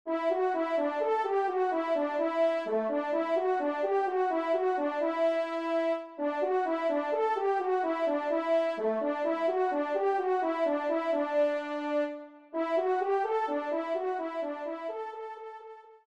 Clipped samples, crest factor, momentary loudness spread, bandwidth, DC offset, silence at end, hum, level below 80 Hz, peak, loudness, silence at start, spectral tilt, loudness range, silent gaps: under 0.1%; 12 dB; 7 LU; 8.8 kHz; under 0.1%; 0.1 s; none; -82 dBFS; -18 dBFS; -30 LUFS; 0.05 s; -5 dB/octave; 2 LU; none